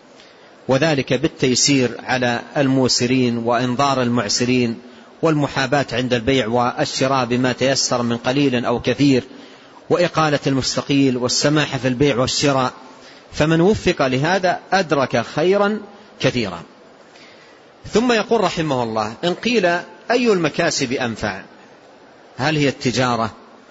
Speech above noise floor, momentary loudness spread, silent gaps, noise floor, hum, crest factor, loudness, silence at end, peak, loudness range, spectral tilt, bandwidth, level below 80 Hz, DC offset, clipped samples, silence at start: 28 dB; 6 LU; none; -46 dBFS; none; 16 dB; -18 LUFS; 0.35 s; -4 dBFS; 4 LU; -4.5 dB/octave; 8 kHz; -48 dBFS; under 0.1%; under 0.1%; 0.7 s